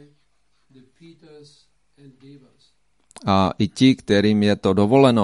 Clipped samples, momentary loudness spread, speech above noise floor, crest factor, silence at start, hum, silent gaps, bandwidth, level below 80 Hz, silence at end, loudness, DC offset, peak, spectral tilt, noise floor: under 0.1%; 6 LU; 49 dB; 18 dB; 3.25 s; 50 Hz at -50 dBFS; none; 11.5 kHz; -56 dBFS; 0 s; -18 LUFS; under 0.1%; -2 dBFS; -6.5 dB/octave; -69 dBFS